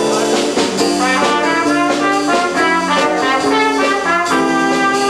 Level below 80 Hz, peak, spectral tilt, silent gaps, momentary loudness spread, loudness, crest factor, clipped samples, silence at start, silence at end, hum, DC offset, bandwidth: -50 dBFS; -2 dBFS; -3 dB/octave; none; 2 LU; -14 LUFS; 12 dB; under 0.1%; 0 s; 0 s; none; under 0.1%; 14 kHz